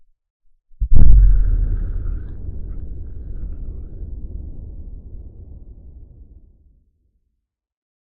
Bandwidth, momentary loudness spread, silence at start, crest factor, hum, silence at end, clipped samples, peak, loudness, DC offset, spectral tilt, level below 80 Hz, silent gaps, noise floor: 1.6 kHz; 26 LU; 0.8 s; 16 dB; none; 3.05 s; 0.6%; 0 dBFS; -23 LUFS; under 0.1%; -12.5 dB/octave; -20 dBFS; none; -75 dBFS